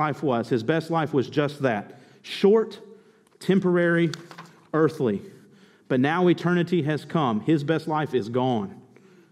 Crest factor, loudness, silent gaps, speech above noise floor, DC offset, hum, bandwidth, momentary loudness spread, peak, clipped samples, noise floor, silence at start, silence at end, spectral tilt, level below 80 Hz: 16 dB; -24 LUFS; none; 31 dB; under 0.1%; none; 13 kHz; 12 LU; -8 dBFS; under 0.1%; -54 dBFS; 0 s; 0.5 s; -7.5 dB/octave; -72 dBFS